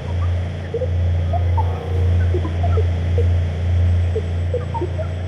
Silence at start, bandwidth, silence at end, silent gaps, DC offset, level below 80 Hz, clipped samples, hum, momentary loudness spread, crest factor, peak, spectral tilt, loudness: 0 s; 6 kHz; 0 s; none; under 0.1%; -28 dBFS; under 0.1%; none; 5 LU; 12 dB; -8 dBFS; -8.5 dB/octave; -20 LUFS